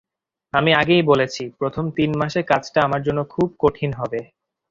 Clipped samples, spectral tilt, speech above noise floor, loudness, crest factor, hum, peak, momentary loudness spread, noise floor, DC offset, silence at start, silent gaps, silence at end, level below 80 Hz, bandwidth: under 0.1%; -6 dB/octave; 31 dB; -20 LUFS; 18 dB; none; -2 dBFS; 10 LU; -50 dBFS; under 0.1%; 0.55 s; none; 0.45 s; -50 dBFS; 7.6 kHz